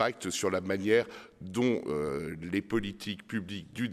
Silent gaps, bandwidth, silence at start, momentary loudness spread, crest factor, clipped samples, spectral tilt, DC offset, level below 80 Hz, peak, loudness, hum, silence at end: none; 15 kHz; 0 s; 11 LU; 20 dB; under 0.1%; -5 dB/octave; under 0.1%; -60 dBFS; -12 dBFS; -32 LUFS; none; 0 s